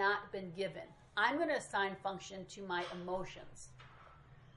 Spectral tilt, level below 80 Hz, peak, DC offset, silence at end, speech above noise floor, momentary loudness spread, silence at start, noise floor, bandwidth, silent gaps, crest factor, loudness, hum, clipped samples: -4 dB/octave; -68 dBFS; -18 dBFS; under 0.1%; 0.05 s; 20 dB; 21 LU; 0 s; -60 dBFS; 11 kHz; none; 22 dB; -39 LUFS; none; under 0.1%